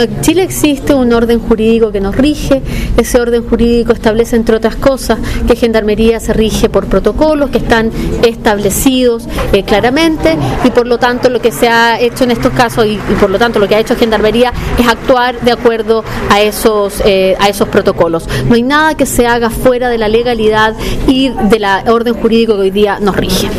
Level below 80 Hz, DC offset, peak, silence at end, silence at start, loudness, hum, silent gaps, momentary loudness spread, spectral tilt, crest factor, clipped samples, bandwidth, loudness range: -22 dBFS; 0.3%; 0 dBFS; 0 s; 0 s; -10 LUFS; none; none; 3 LU; -5 dB/octave; 10 dB; under 0.1%; 16 kHz; 1 LU